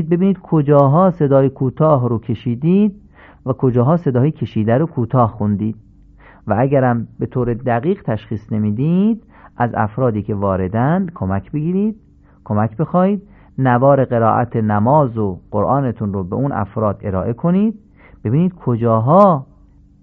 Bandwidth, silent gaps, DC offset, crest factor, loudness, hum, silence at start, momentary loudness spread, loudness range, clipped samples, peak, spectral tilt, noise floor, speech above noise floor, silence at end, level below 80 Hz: 4 kHz; none; under 0.1%; 16 dB; -16 LUFS; none; 0 s; 9 LU; 4 LU; under 0.1%; 0 dBFS; -12 dB/octave; -47 dBFS; 31 dB; 0.6 s; -42 dBFS